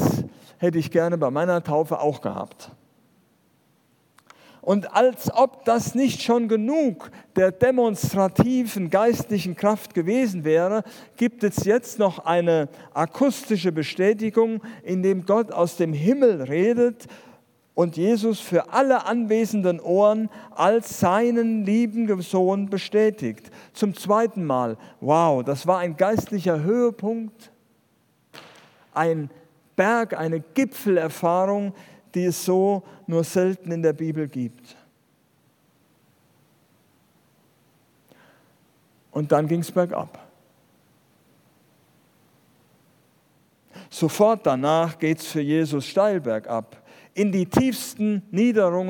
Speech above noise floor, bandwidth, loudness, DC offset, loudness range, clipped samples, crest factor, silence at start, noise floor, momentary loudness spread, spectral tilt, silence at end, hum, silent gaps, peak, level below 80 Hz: 42 dB; 18 kHz; -22 LUFS; under 0.1%; 7 LU; under 0.1%; 22 dB; 0 s; -64 dBFS; 10 LU; -6.5 dB/octave; 0 s; none; none; -2 dBFS; -66 dBFS